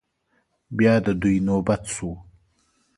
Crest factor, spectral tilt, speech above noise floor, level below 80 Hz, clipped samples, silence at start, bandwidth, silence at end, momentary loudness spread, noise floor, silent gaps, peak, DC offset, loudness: 20 dB; -6.5 dB/octave; 48 dB; -46 dBFS; under 0.1%; 0.7 s; 11.5 kHz; 0.75 s; 15 LU; -69 dBFS; none; -4 dBFS; under 0.1%; -22 LUFS